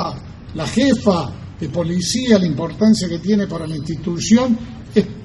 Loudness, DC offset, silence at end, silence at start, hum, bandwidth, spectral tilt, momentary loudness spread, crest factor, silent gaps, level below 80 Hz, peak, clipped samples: -18 LUFS; under 0.1%; 0 s; 0 s; none; 12 kHz; -5.5 dB/octave; 11 LU; 18 dB; none; -42 dBFS; 0 dBFS; under 0.1%